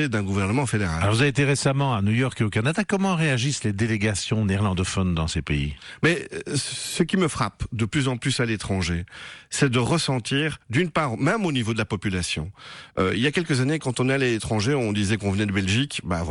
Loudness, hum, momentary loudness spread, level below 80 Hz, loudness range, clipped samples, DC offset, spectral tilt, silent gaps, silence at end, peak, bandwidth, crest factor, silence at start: -24 LUFS; none; 6 LU; -44 dBFS; 3 LU; under 0.1%; under 0.1%; -5 dB/octave; none; 0 s; -8 dBFS; 12 kHz; 14 dB; 0 s